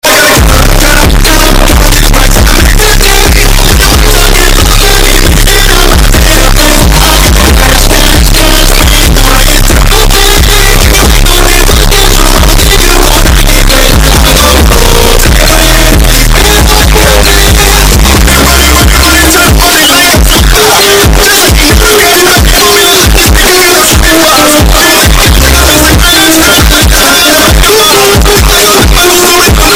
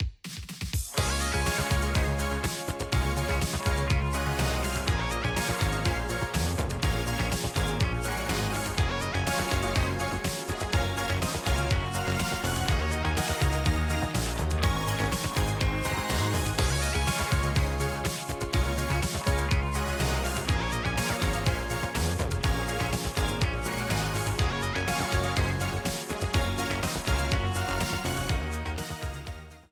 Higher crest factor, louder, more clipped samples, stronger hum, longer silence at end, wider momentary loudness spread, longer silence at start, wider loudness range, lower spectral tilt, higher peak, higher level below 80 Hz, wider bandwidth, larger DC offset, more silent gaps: second, 2 dB vs 16 dB; first, -3 LUFS vs -28 LUFS; first, 10% vs under 0.1%; neither; about the same, 0 s vs 0.1 s; about the same, 3 LU vs 4 LU; about the same, 0.05 s vs 0 s; about the same, 2 LU vs 1 LU; second, -3 dB/octave vs -4.5 dB/octave; first, 0 dBFS vs -12 dBFS; first, -6 dBFS vs -34 dBFS; about the same, over 20 kHz vs over 20 kHz; neither; neither